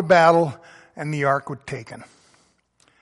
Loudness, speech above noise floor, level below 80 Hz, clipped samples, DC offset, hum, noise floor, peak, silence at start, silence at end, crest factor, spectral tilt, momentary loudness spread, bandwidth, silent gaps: -20 LUFS; 42 dB; -62 dBFS; under 0.1%; under 0.1%; none; -62 dBFS; -2 dBFS; 0 s; 1 s; 20 dB; -6 dB/octave; 26 LU; 11.5 kHz; none